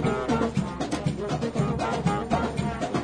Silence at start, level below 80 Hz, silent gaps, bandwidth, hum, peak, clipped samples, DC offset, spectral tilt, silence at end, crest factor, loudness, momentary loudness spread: 0 s; -42 dBFS; none; 10.5 kHz; none; -10 dBFS; under 0.1%; under 0.1%; -6.5 dB/octave; 0 s; 16 dB; -27 LUFS; 4 LU